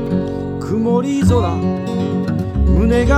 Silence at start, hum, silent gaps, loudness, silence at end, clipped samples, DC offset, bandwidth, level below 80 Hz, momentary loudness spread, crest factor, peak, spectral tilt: 0 s; none; none; -17 LUFS; 0 s; under 0.1%; under 0.1%; 12 kHz; -22 dBFS; 6 LU; 14 dB; -2 dBFS; -8 dB/octave